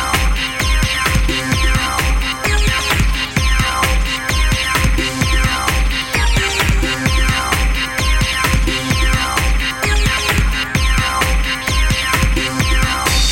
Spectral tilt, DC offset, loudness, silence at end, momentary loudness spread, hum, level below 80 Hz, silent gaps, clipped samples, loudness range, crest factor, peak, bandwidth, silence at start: -3.5 dB/octave; under 0.1%; -15 LUFS; 0 s; 2 LU; none; -18 dBFS; none; under 0.1%; 0 LU; 14 dB; 0 dBFS; 17 kHz; 0 s